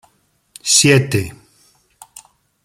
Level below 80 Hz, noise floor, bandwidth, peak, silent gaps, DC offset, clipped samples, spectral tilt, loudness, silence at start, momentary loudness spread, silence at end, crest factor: -52 dBFS; -61 dBFS; 16 kHz; 0 dBFS; none; under 0.1%; under 0.1%; -3 dB/octave; -13 LUFS; 0.65 s; 16 LU; 1.35 s; 20 dB